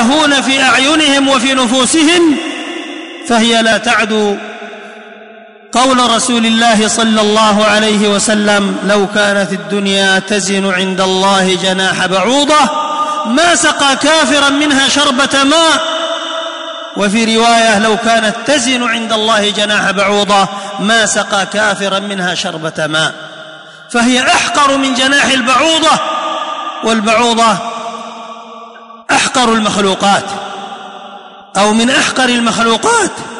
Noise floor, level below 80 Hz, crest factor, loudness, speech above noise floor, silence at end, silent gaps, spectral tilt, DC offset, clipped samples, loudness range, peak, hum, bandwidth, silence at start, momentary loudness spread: -35 dBFS; -50 dBFS; 10 dB; -10 LUFS; 25 dB; 0 s; none; -2.5 dB/octave; 0.3%; under 0.1%; 4 LU; -2 dBFS; none; 11 kHz; 0 s; 13 LU